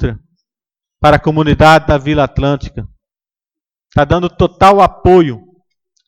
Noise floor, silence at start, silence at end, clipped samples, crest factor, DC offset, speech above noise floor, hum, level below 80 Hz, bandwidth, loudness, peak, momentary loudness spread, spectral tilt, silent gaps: under -90 dBFS; 0 s; 0.7 s; under 0.1%; 12 dB; under 0.1%; over 80 dB; none; -28 dBFS; 15.5 kHz; -11 LUFS; 0 dBFS; 13 LU; -7 dB/octave; none